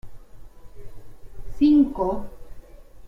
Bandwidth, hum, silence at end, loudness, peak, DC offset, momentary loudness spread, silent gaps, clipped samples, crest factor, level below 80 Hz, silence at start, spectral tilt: 5.4 kHz; none; 0 s; -21 LUFS; -8 dBFS; under 0.1%; 26 LU; none; under 0.1%; 16 dB; -40 dBFS; 0.05 s; -8 dB/octave